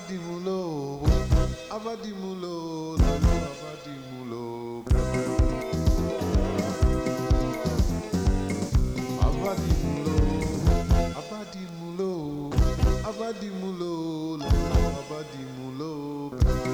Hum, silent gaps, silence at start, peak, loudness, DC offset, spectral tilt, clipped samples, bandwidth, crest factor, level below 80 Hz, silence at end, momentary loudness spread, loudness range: none; none; 0 s; -8 dBFS; -28 LUFS; under 0.1%; -6.5 dB/octave; under 0.1%; 16 kHz; 18 dB; -28 dBFS; 0 s; 11 LU; 4 LU